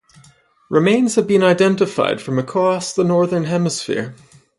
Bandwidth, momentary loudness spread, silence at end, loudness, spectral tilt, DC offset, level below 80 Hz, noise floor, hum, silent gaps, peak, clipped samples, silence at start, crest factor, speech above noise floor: 11.5 kHz; 7 LU; 0.45 s; -17 LUFS; -5.5 dB/octave; under 0.1%; -60 dBFS; -51 dBFS; none; none; -2 dBFS; under 0.1%; 0.7 s; 16 dB; 35 dB